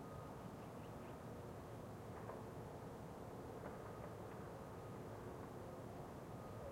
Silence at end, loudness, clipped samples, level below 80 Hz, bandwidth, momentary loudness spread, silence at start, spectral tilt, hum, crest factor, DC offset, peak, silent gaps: 0 s; -53 LUFS; under 0.1%; -68 dBFS; 16 kHz; 1 LU; 0 s; -7 dB/octave; none; 14 dB; under 0.1%; -38 dBFS; none